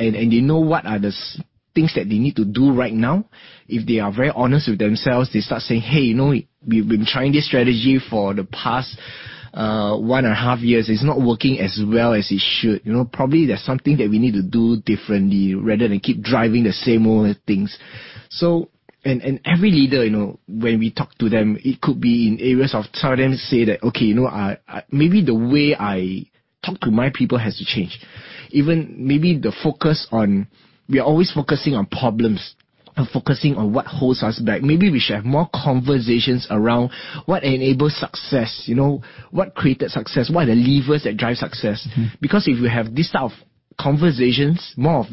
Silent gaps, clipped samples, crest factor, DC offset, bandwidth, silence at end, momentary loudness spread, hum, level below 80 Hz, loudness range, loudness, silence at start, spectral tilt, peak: none; under 0.1%; 16 dB; under 0.1%; 5.8 kHz; 0 s; 8 LU; none; -48 dBFS; 2 LU; -18 LUFS; 0 s; -11 dB/octave; -2 dBFS